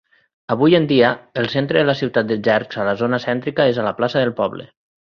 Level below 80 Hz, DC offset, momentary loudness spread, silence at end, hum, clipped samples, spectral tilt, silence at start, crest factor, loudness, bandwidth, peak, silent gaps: -56 dBFS; under 0.1%; 8 LU; 0.35 s; none; under 0.1%; -7.5 dB/octave; 0.5 s; 18 dB; -18 LUFS; 6.8 kHz; -2 dBFS; none